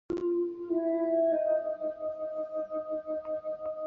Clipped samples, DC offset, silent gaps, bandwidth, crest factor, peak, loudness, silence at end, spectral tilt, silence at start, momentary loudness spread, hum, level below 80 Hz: under 0.1%; under 0.1%; none; 4.2 kHz; 12 dB; -18 dBFS; -32 LUFS; 0 s; -8.5 dB/octave; 0.1 s; 9 LU; none; -68 dBFS